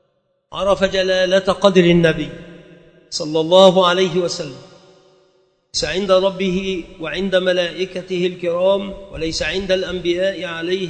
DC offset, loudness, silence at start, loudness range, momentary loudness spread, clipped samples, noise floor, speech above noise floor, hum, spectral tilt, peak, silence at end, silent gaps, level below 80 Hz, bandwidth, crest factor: under 0.1%; -17 LUFS; 0.5 s; 5 LU; 14 LU; under 0.1%; -65 dBFS; 48 dB; none; -5 dB/octave; 0 dBFS; 0 s; none; -44 dBFS; 9 kHz; 18 dB